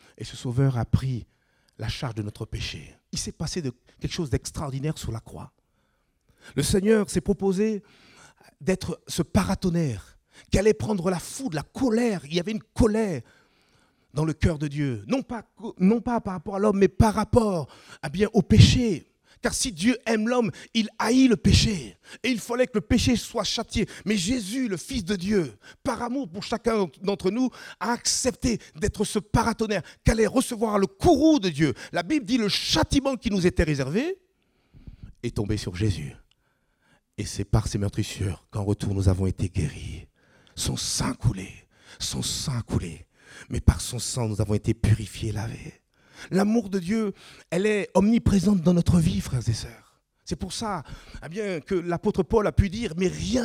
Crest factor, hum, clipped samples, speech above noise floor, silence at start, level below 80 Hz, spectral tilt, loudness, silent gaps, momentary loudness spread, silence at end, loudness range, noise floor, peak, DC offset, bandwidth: 24 dB; none; under 0.1%; 45 dB; 0.2 s; -40 dBFS; -5.5 dB/octave; -25 LUFS; none; 13 LU; 0 s; 7 LU; -70 dBFS; -2 dBFS; under 0.1%; 16 kHz